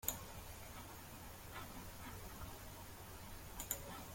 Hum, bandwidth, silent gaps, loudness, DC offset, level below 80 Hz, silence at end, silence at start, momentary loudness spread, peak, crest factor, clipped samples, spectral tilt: none; 17 kHz; none; -50 LUFS; under 0.1%; -60 dBFS; 0 s; 0 s; 9 LU; -18 dBFS; 32 dB; under 0.1%; -3 dB/octave